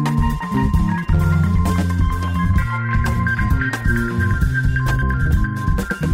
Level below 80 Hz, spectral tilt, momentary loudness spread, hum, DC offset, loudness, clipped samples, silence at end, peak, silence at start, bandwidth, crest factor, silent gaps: -22 dBFS; -7 dB/octave; 3 LU; none; under 0.1%; -19 LUFS; under 0.1%; 0 s; -6 dBFS; 0 s; 16 kHz; 12 dB; none